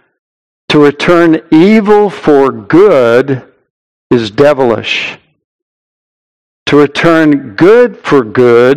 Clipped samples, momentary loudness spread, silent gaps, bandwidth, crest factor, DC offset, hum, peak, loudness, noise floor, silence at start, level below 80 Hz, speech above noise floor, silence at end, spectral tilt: 6%; 7 LU; 3.70-4.10 s, 5.44-6.66 s; 11 kHz; 8 dB; 0.8%; none; 0 dBFS; -8 LUFS; under -90 dBFS; 0.7 s; -44 dBFS; over 83 dB; 0 s; -6.5 dB/octave